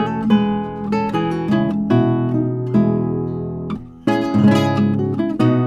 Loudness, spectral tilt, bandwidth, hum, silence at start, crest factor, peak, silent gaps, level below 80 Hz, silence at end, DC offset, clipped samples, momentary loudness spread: -18 LUFS; -8.5 dB/octave; 8.4 kHz; none; 0 s; 14 dB; -2 dBFS; none; -48 dBFS; 0 s; under 0.1%; under 0.1%; 9 LU